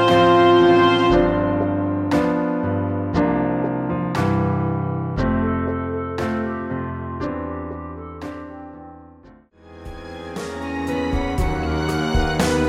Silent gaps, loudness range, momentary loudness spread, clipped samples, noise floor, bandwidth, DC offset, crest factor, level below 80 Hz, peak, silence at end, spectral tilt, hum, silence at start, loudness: none; 14 LU; 19 LU; under 0.1%; -48 dBFS; 14 kHz; under 0.1%; 16 dB; -34 dBFS; -4 dBFS; 0 s; -6.5 dB/octave; none; 0 s; -20 LUFS